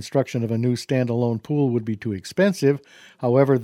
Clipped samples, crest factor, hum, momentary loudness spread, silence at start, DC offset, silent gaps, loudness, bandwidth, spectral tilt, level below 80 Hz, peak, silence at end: under 0.1%; 18 dB; none; 9 LU; 0 s; under 0.1%; none; -22 LUFS; 15 kHz; -7 dB/octave; -66 dBFS; -4 dBFS; 0 s